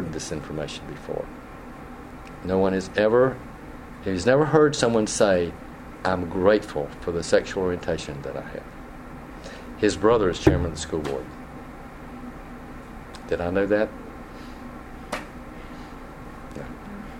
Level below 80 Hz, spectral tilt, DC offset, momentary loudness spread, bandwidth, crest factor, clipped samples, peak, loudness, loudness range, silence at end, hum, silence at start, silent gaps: -42 dBFS; -5.5 dB/octave; under 0.1%; 21 LU; 16 kHz; 24 dB; under 0.1%; -2 dBFS; -24 LUFS; 8 LU; 0 s; none; 0 s; none